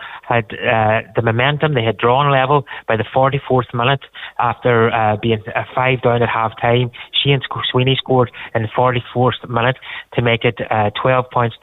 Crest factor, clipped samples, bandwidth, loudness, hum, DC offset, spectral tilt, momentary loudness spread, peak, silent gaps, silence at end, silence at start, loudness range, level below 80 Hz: 14 dB; under 0.1%; 4.1 kHz; -16 LUFS; none; under 0.1%; -9 dB/octave; 5 LU; -4 dBFS; none; 0.05 s; 0 s; 1 LU; -48 dBFS